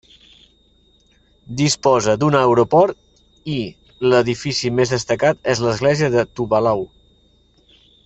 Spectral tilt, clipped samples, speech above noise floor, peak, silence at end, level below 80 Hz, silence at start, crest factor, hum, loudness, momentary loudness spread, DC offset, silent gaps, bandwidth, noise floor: -5 dB/octave; under 0.1%; 40 dB; -2 dBFS; 1.2 s; -50 dBFS; 1.5 s; 16 dB; none; -17 LUFS; 11 LU; under 0.1%; none; 8.4 kHz; -56 dBFS